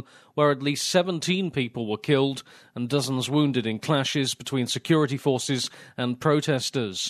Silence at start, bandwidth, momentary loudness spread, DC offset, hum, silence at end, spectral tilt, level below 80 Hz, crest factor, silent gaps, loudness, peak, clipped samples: 0.35 s; 13.5 kHz; 7 LU; under 0.1%; none; 0 s; -4.5 dB/octave; -68 dBFS; 18 dB; none; -25 LUFS; -8 dBFS; under 0.1%